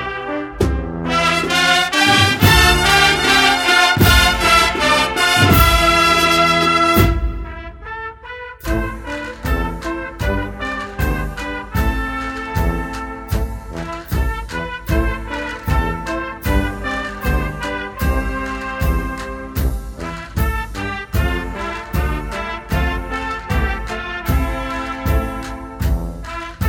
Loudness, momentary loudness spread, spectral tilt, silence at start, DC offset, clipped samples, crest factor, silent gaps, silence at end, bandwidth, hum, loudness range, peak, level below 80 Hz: -17 LUFS; 15 LU; -4 dB/octave; 0 s; under 0.1%; under 0.1%; 18 dB; none; 0 s; 18 kHz; none; 11 LU; 0 dBFS; -24 dBFS